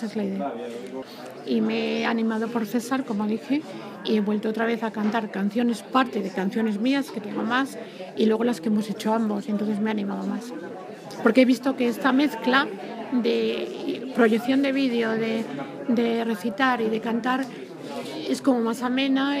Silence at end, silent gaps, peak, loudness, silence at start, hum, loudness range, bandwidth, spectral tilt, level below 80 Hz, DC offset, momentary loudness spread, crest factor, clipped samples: 0 s; none; -2 dBFS; -25 LUFS; 0 s; none; 3 LU; 15.5 kHz; -5.5 dB/octave; -78 dBFS; under 0.1%; 12 LU; 22 dB; under 0.1%